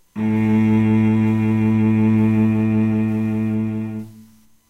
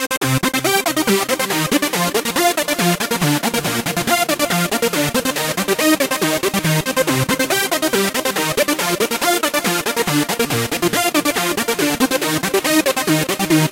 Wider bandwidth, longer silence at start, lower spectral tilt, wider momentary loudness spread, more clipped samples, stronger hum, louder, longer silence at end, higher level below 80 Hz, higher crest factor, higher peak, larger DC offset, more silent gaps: second, 4.1 kHz vs 17 kHz; first, 0.15 s vs 0 s; first, -9.5 dB/octave vs -3.5 dB/octave; first, 7 LU vs 2 LU; neither; neither; about the same, -18 LUFS vs -17 LUFS; first, 0.5 s vs 0 s; about the same, -48 dBFS vs -48 dBFS; second, 10 dB vs 16 dB; second, -8 dBFS vs -2 dBFS; neither; second, none vs 0.17-0.21 s